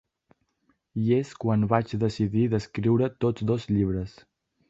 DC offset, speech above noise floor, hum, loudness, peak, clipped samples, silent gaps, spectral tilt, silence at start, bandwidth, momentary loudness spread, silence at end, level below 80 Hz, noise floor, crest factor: under 0.1%; 46 dB; none; -26 LUFS; -6 dBFS; under 0.1%; none; -8.5 dB/octave; 0.95 s; 7.8 kHz; 5 LU; 0.6 s; -50 dBFS; -71 dBFS; 20 dB